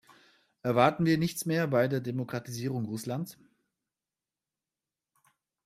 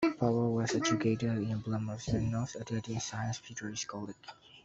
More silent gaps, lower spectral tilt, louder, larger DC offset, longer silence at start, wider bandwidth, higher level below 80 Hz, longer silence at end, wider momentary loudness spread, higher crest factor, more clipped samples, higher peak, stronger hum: neither; about the same, -6 dB/octave vs -5.5 dB/octave; first, -30 LUFS vs -34 LUFS; neither; first, 0.65 s vs 0 s; first, 15.5 kHz vs 8 kHz; second, -68 dBFS vs -58 dBFS; first, 2.35 s vs 0.05 s; about the same, 12 LU vs 10 LU; about the same, 22 dB vs 18 dB; neither; first, -8 dBFS vs -16 dBFS; neither